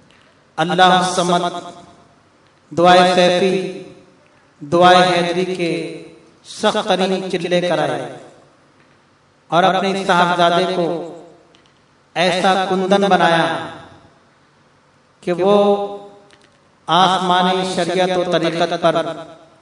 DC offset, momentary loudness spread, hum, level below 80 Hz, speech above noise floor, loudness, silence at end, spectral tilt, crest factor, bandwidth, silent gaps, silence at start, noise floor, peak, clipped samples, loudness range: under 0.1%; 16 LU; none; -64 dBFS; 39 dB; -16 LUFS; 0.25 s; -4.5 dB/octave; 18 dB; 11 kHz; none; 0.55 s; -54 dBFS; 0 dBFS; under 0.1%; 5 LU